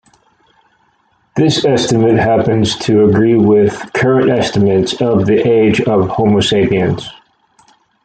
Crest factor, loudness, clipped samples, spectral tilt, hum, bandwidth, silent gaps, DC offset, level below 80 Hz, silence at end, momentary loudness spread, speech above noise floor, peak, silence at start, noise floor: 12 dB; -12 LUFS; under 0.1%; -6 dB/octave; none; 9.2 kHz; none; under 0.1%; -44 dBFS; 0.95 s; 5 LU; 46 dB; 0 dBFS; 1.35 s; -57 dBFS